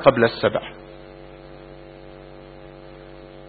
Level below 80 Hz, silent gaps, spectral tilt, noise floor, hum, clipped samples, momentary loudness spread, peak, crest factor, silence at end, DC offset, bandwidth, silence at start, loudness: -50 dBFS; none; -10 dB/octave; -42 dBFS; none; under 0.1%; 23 LU; 0 dBFS; 24 dB; 0.05 s; under 0.1%; 4.8 kHz; 0 s; -21 LUFS